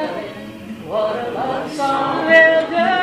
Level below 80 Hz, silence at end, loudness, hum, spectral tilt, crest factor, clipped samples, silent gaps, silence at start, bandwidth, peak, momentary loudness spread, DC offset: -56 dBFS; 0 s; -16 LUFS; none; -4.5 dB/octave; 18 dB; under 0.1%; none; 0 s; 12.5 kHz; 0 dBFS; 21 LU; under 0.1%